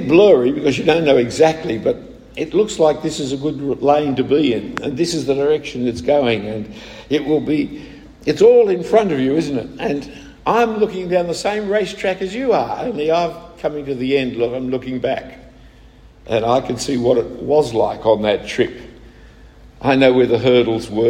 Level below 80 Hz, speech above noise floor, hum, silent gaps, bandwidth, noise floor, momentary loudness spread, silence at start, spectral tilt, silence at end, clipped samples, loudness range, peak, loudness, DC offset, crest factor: -46 dBFS; 28 dB; none; none; 13 kHz; -44 dBFS; 11 LU; 0 s; -5.5 dB/octave; 0 s; under 0.1%; 4 LU; 0 dBFS; -17 LUFS; under 0.1%; 16 dB